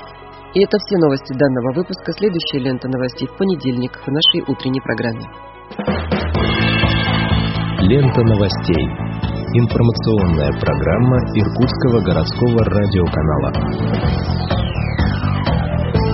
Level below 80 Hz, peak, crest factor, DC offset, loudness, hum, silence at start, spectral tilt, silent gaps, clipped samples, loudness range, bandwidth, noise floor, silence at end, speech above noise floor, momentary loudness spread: -28 dBFS; 0 dBFS; 16 dB; under 0.1%; -17 LUFS; none; 0 s; -5.5 dB/octave; none; under 0.1%; 3 LU; 6 kHz; -36 dBFS; 0 s; 20 dB; 8 LU